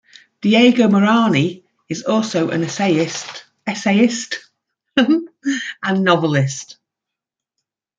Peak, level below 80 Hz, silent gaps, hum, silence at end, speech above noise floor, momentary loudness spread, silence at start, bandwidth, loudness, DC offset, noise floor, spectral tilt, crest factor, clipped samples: -2 dBFS; -62 dBFS; none; none; 1.25 s; 68 dB; 14 LU; 0.45 s; 9.2 kHz; -17 LUFS; under 0.1%; -84 dBFS; -5 dB/octave; 16 dB; under 0.1%